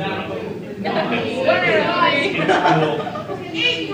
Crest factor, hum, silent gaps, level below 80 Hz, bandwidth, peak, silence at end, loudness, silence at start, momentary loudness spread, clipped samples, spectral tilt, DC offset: 16 dB; none; none; -56 dBFS; 15.5 kHz; -2 dBFS; 0 s; -18 LUFS; 0 s; 11 LU; under 0.1%; -5.5 dB/octave; under 0.1%